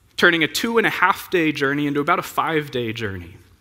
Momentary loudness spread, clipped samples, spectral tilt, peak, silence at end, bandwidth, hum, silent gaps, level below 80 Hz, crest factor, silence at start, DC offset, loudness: 10 LU; under 0.1%; -4.5 dB/octave; 0 dBFS; 0.25 s; 16.5 kHz; none; none; -56 dBFS; 20 dB; 0.2 s; under 0.1%; -20 LUFS